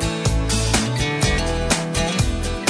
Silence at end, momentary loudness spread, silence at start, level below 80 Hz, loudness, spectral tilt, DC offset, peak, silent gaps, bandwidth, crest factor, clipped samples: 0 s; 3 LU; 0 s; -26 dBFS; -20 LUFS; -4 dB/octave; under 0.1%; -6 dBFS; none; 11 kHz; 14 dB; under 0.1%